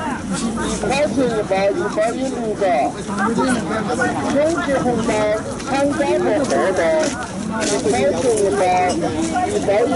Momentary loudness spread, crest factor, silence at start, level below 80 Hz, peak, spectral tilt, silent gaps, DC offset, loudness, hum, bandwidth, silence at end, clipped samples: 5 LU; 12 dB; 0 s; -42 dBFS; -6 dBFS; -4.5 dB/octave; none; under 0.1%; -19 LUFS; none; 11.5 kHz; 0 s; under 0.1%